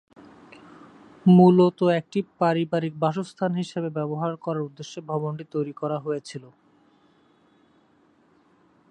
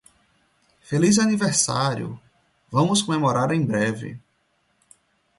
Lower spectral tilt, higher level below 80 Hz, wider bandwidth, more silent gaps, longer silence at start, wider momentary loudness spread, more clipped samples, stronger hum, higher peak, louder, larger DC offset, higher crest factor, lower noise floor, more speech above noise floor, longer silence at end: first, -8 dB/octave vs -4.5 dB/octave; second, -72 dBFS vs -60 dBFS; second, 9.2 kHz vs 11.5 kHz; neither; first, 1.25 s vs 0.9 s; about the same, 15 LU vs 14 LU; neither; neither; about the same, -4 dBFS vs -4 dBFS; about the same, -23 LUFS vs -21 LUFS; neither; about the same, 20 dB vs 18 dB; second, -61 dBFS vs -68 dBFS; second, 38 dB vs 47 dB; first, 2.45 s vs 1.2 s